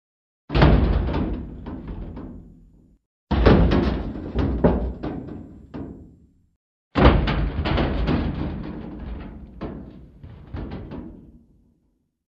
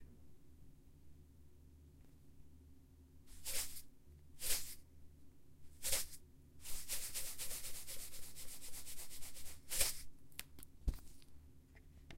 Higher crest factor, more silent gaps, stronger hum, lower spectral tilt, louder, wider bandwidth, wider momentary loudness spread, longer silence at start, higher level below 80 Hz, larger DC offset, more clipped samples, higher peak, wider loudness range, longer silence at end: about the same, 24 dB vs 26 dB; first, 3.06-3.27 s, 6.56-6.91 s vs none; neither; first, -9 dB/octave vs -1 dB/octave; first, -22 LUFS vs -44 LUFS; second, 5.8 kHz vs 16 kHz; second, 22 LU vs 26 LU; first, 0.5 s vs 0 s; first, -28 dBFS vs -56 dBFS; neither; neither; first, 0 dBFS vs -20 dBFS; first, 12 LU vs 7 LU; first, 1.1 s vs 0 s